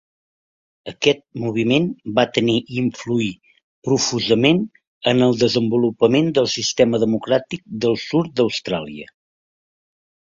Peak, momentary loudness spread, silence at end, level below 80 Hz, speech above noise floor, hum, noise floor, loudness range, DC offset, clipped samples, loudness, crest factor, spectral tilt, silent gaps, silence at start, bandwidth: 0 dBFS; 10 LU; 1.3 s; -56 dBFS; over 71 dB; none; under -90 dBFS; 4 LU; under 0.1%; under 0.1%; -19 LUFS; 20 dB; -5 dB/octave; 3.64-3.82 s, 4.87-5.01 s; 0.85 s; 7.6 kHz